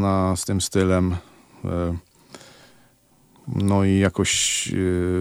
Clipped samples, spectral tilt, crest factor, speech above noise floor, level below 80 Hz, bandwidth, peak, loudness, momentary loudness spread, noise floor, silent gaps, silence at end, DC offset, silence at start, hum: under 0.1%; -4.5 dB/octave; 16 dB; 37 dB; -46 dBFS; 16 kHz; -6 dBFS; -22 LUFS; 12 LU; -57 dBFS; none; 0 s; under 0.1%; 0 s; none